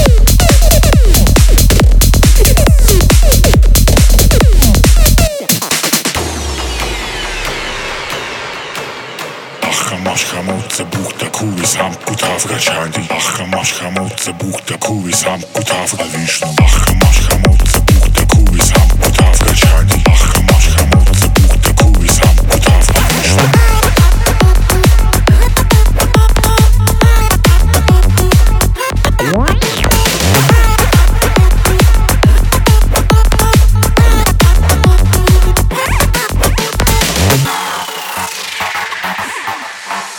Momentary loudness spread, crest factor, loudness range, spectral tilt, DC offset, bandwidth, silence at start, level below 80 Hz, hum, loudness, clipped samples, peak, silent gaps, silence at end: 10 LU; 8 dB; 7 LU; -4 dB/octave; under 0.1%; 19 kHz; 0 s; -10 dBFS; none; -10 LUFS; under 0.1%; 0 dBFS; none; 0 s